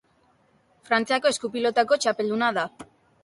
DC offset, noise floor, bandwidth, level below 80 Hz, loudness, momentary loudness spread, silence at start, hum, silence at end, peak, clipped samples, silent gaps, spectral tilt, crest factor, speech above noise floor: under 0.1%; -63 dBFS; 11.5 kHz; -72 dBFS; -24 LUFS; 4 LU; 0.9 s; none; 0.4 s; -8 dBFS; under 0.1%; none; -3 dB/octave; 18 dB; 40 dB